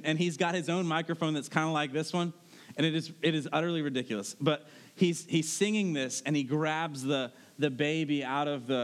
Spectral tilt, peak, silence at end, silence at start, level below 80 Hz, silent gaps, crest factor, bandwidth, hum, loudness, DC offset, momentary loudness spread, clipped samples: -5 dB/octave; -10 dBFS; 0 s; 0 s; under -90 dBFS; none; 20 dB; 14 kHz; none; -31 LUFS; under 0.1%; 4 LU; under 0.1%